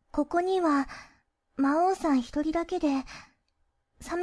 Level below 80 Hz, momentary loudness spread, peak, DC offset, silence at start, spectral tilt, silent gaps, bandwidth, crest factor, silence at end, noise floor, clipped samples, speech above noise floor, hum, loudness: -54 dBFS; 19 LU; -14 dBFS; under 0.1%; 0.15 s; -5 dB/octave; none; 11 kHz; 14 dB; 0 s; -74 dBFS; under 0.1%; 47 dB; none; -28 LUFS